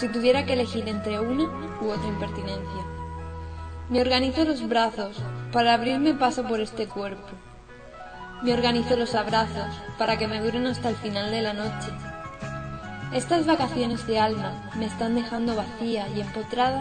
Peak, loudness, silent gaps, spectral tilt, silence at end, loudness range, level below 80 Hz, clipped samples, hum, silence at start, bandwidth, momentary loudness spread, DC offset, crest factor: -8 dBFS; -26 LUFS; none; -5.5 dB/octave; 0 s; 4 LU; -46 dBFS; under 0.1%; none; 0 s; 9.4 kHz; 14 LU; under 0.1%; 18 dB